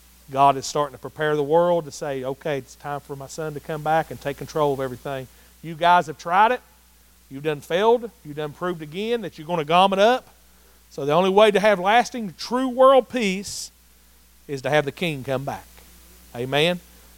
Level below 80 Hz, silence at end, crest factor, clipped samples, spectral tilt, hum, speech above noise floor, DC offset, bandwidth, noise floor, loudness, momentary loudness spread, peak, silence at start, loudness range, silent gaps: -56 dBFS; 0.4 s; 20 dB; under 0.1%; -4.5 dB/octave; none; 33 dB; under 0.1%; 17 kHz; -54 dBFS; -22 LUFS; 16 LU; -2 dBFS; 0.3 s; 8 LU; none